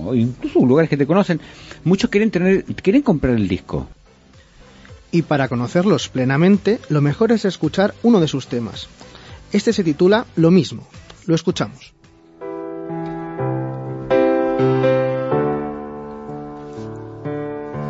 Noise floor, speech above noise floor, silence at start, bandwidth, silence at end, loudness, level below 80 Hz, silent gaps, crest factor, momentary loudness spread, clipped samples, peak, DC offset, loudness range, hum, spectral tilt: -48 dBFS; 31 dB; 0 s; 8 kHz; 0 s; -18 LUFS; -44 dBFS; none; 16 dB; 17 LU; under 0.1%; -2 dBFS; under 0.1%; 5 LU; none; -7 dB/octave